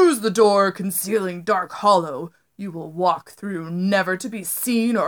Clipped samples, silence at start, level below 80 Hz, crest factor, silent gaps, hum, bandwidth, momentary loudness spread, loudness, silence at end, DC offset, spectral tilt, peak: under 0.1%; 0 s; -76 dBFS; 18 dB; none; none; over 20 kHz; 15 LU; -21 LUFS; 0 s; under 0.1%; -4.5 dB/octave; -2 dBFS